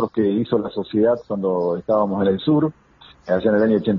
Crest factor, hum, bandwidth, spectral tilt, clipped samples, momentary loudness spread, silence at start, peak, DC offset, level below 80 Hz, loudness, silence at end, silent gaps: 14 dB; none; 5.6 kHz; -6.5 dB/octave; under 0.1%; 6 LU; 0 s; -4 dBFS; under 0.1%; -54 dBFS; -20 LUFS; 0 s; none